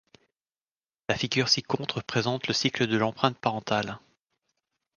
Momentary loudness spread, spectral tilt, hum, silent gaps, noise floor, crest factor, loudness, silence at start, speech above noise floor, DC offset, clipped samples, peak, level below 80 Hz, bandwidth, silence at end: 8 LU; -4 dB/octave; none; none; under -90 dBFS; 24 dB; -27 LUFS; 1.1 s; over 63 dB; under 0.1%; under 0.1%; -6 dBFS; -62 dBFS; 10 kHz; 1 s